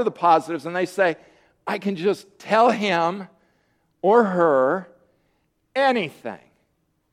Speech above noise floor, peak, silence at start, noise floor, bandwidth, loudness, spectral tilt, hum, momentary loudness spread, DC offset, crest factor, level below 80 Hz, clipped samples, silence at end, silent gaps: 49 dB; -2 dBFS; 0 s; -69 dBFS; 13 kHz; -21 LUFS; -5.5 dB/octave; none; 17 LU; under 0.1%; 20 dB; -72 dBFS; under 0.1%; 0.75 s; none